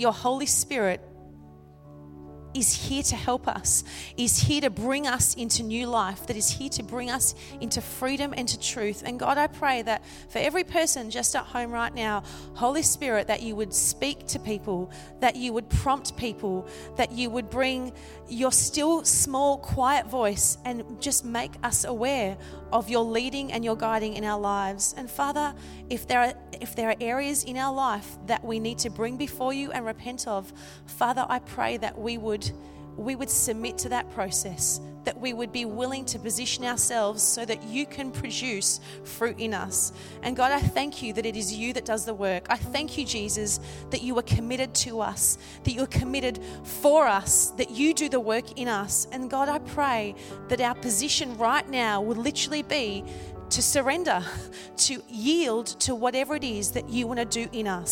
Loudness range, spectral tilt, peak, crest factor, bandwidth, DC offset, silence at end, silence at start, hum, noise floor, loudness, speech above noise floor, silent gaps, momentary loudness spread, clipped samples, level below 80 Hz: 5 LU; -3 dB/octave; -8 dBFS; 20 dB; 17.5 kHz; under 0.1%; 0 s; 0 s; none; -49 dBFS; -26 LUFS; 22 dB; none; 10 LU; under 0.1%; -46 dBFS